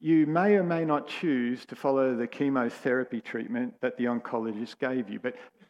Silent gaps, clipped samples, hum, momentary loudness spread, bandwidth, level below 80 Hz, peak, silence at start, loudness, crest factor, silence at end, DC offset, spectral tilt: none; under 0.1%; none; 10 LU; 10.5 kHz; -80 dBFS; -12 dBFS; 0 s; -29 LUFS; 16 dB; 0.2 s; under 0.1%; -7.5 dB/octave